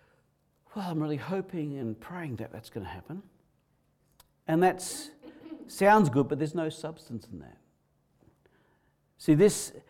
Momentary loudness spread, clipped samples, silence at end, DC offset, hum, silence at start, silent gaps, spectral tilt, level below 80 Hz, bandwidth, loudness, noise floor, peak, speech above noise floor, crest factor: 22 LU; under 0.1%; 0.1 s; under 0.1%; none; 0.75 s; none; -6 dB/octave; -64 dBFS; 17.5 kHz; -28 LUFS; -71 dBFS; -12 dBFS; 42 dB; 20 dB